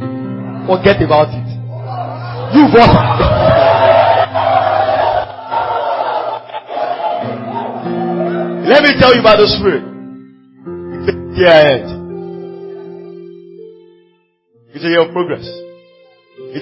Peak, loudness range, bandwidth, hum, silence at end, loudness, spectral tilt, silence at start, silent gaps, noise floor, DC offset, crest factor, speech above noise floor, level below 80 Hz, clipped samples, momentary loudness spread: 0 dBFS; 11 LU; 8 kHz; none; 0 s; -12 LUFS; -8 dB/octave; 0 s; none; -56 dBFS; under 0.1%; 14 dB; 47 dB; -34 dBFS; 0.1%; 21 LU